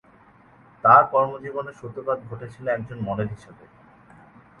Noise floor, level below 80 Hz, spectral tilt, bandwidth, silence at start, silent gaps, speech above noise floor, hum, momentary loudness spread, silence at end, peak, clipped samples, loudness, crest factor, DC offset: -53 dBFS; -58 dBFS; -8.5 dB/octave; 10.5 kHz; 0.85 s; none; 31 dB; none; 18 LU; 1.05 s; -2 dBFS; under 0.1%; -22 LUFS; 24 dB; under 0.1%